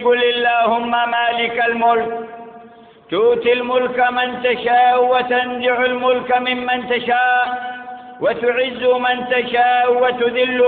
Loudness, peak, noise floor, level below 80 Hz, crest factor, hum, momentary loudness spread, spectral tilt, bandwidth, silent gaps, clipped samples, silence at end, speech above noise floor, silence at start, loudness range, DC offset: -16 LUFS; -4 dBFS; -42 dBFS; -58 dBFS; 12 dB; none; 7 LU; -8.5 dB/octave; 4.5 kHz; none; under 0.1%; 0 s; 26 dB; 0 s; 2 LU; under 0.1%